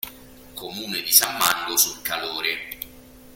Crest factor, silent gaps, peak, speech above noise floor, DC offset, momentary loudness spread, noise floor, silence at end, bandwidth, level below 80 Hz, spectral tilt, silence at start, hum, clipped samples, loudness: 26 dB; none; 0 dBFS; 23 dB; under 0.1%; 20 LU; -46 dBFS; 0 s; 17 kHz; -56 dBFS; 0.5 dB/octave; 0.05 s; none; under 0.1%; -20 LUFS